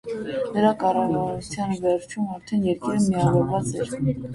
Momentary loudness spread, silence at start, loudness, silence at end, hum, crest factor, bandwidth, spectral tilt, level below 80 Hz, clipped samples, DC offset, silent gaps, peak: 8 LU; 0.05 s; -24 LUFS; 0 s; none; 18 dB; 11.5 kHz; -7 dB/octave; -52 dBFS; under 0.1%; under 0.1%; none; -6 dBFS